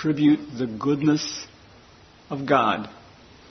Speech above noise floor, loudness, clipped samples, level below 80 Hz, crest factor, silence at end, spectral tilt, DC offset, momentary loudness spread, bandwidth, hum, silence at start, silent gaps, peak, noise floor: 28 dB; -23 LUFS; under 0.1%; -60 dBFS; 20 dB; 0.55 s; -5.5 dB/octave; under 0.1%; 15 LU; 6.4 kHz; none; 0 s; none; -4 dBFS; -51 dBFS